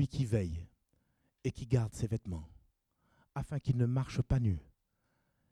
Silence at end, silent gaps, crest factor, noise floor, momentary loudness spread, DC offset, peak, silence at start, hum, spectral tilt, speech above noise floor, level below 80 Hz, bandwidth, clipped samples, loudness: 0.9 s; none; 18 dB; -79 dBFS; 13 LU; under 0.1%; -18 dBFS; 0 s; none; -8 dB/octave; 45 dB; -50 dBFS; 11 kHz; under 0.1%; -35 LUFS